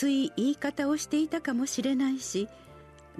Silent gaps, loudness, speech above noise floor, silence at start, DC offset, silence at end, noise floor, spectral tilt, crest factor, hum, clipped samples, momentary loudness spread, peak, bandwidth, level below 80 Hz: none; -29 LUFS; 19 dB; 0 s; under 0.1%; 0 s; -48 dBFS; -3.5 dB/octave; 14 dB; none; under 0.1%; 5 LU; -16 dBFS; 13.5 kHz; -64 dBFS